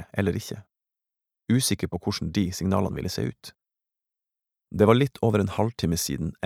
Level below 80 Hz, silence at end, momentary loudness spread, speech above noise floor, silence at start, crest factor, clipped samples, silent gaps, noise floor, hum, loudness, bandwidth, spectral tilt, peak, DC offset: -50 dBFS; 0 s; 17 LU; 64 dB; 0 s; 24 dB; under 0.1%; none; -88 dBFS; none; -25 LUFS; 17 kHz; -5.5 dB/octave; -4 dBFS; under 0.1%